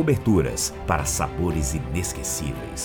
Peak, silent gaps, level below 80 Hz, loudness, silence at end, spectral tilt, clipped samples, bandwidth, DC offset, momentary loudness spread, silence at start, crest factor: -6 dBFS; none; -36 dBFS; -24 LUFS; 0 s; -5 dB/octave; under 0.1%; 19.5 kHz; under 0.1%; 7 LU; 0 s; 18 dB